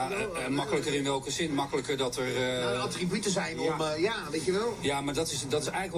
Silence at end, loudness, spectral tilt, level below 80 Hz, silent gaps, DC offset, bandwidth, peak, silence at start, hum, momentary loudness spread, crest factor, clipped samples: 0 s; -30 LUFS; -4 dB/octave; -56 dBFS; none; under 0.1%; 15.5 kHz; -16 dBFS; 0 s; none; 2 LU; 14 dB; under 0.1%